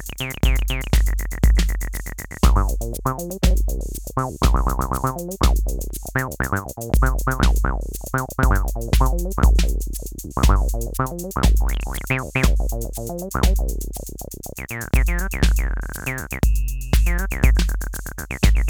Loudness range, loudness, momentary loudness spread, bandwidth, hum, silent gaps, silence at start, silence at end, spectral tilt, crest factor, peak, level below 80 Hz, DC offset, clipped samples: 3 LU; -22 LUFS; 10 LU; 19.5 kHz; none; none; 0 s; 0 s; -5 dB/octave; 20 dB; 0 dBFS; -20 dBFS; under 0.1%; under 0.1%